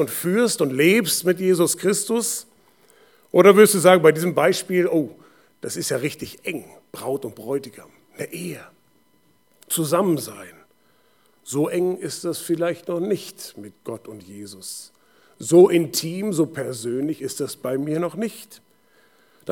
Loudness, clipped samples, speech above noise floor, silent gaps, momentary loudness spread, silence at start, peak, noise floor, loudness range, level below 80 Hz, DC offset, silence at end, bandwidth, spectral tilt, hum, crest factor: -20 LUFS; under 0.1%; 42 dB; none; 22 LU; 0 s; 0 dBFS; -62 dBFS; 12 LU; -72 dBFS; under 0.1%; 0 s; 19 kHz; -4.5 dB/octave; none; 22 dB